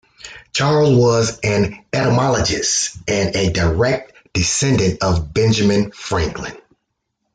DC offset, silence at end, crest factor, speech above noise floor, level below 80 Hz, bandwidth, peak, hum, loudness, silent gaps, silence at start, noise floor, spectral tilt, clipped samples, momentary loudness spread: under 0.1%; 0.75 s; 14 dB; 57 dB; -38 dBFS; 9.6 kHz; -4 dBFS; none; -17 LUFS; none; 0.25 s; -73 dBFS; -4.5 dB/octave; under 0.1%; 10 LU